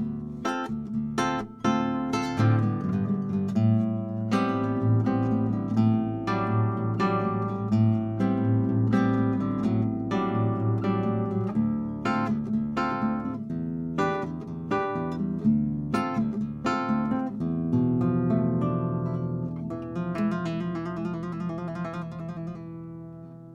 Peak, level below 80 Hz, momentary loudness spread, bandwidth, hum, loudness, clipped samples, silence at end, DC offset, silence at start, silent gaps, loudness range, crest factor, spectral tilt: -10 dBFS; -56 dBFS; 9 LU; 9.6 kHz; none; -27 LUFS; under 0.1%; 0 s; under 0.1%; 0 s; none; 4 LU; 16 dB; -8 dB/octave